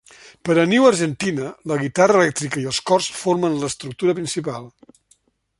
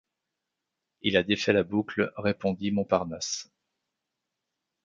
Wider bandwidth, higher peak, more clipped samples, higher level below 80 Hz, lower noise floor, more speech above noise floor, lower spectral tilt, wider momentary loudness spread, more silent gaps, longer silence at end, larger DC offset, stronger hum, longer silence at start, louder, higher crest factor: first, 11.5 kHz vs 7.8 kHz; first, -2 dBFS vs -8 dBFS; neither; about the same, -60 dBFS vs -60 dBFS; second, -61 dBFS vs -85 dBFS; second, 42 dB vs 58 dB; about the same, -4.5 dB/octave vs -4.5 dB/octave; first, 12 LU vs 8 LU; neither; second, 0.9 s vs 1.45 s; neither; neither; second, 0.25 s vs 1.05 s; first, -19 LUFS vs -28 LUFS; about the same, 18 dB vs 22 dB